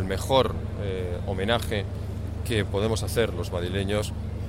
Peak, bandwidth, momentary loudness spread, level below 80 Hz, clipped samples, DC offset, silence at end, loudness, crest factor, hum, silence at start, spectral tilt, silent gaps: -6 dBFS; 16 kHz; 9 LU; -36 dBFS; under 0.1%; under 0.1%; 0 s; -27 LUFS; 20 dB; none; 0 s; -5.5 dB/octave; none